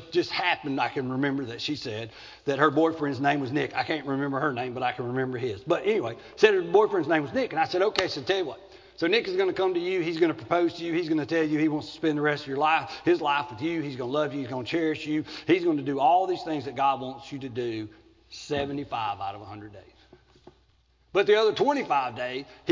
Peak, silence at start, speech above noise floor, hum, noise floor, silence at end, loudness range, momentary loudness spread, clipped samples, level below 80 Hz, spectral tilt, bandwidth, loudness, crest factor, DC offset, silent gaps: -4 dBFS; 0 s; 38 dB; none; -64 dBFS; 0 s; 6 LU; 11 LU; under 0.1%; -62 dBFS; -6 dB/octave; 7.6 kHz; -27 LUFS; 22 dB; under 0.1%; none